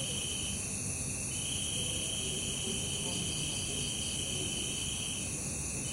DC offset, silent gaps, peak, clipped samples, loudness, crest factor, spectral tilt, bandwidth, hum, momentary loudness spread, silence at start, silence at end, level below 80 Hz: under 0.1%; none; -22 dBFS; under 0.1%; -33 LUFS; 14 dB; -2 dB/octave; 16 kHz; none; 2 LU; 0 s; 0 s; -50 dBFS